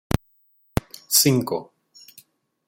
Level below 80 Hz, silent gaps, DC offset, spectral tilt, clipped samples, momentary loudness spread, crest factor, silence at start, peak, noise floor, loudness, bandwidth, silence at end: -44 dBFS; none; under 0.1%; -3.5 dB/octave; under 0.1%; 13 LU; 22 dB; 1.1 s; -2 dBFS; -62 dBFS; -22 LUFS; 17 kHz; 1.05 s